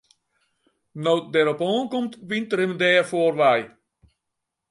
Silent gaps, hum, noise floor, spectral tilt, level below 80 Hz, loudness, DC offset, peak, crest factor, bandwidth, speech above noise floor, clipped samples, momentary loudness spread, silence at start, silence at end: none; none; -82 dBFS; -5 dB/octave; -72 dBFS; -22 LUFS; under 0.1%; -4 dBFS; 20 dB; 11.5 kHz; 60 dB; under 0.1%; 10 LU; 0.95 s; 1.05 s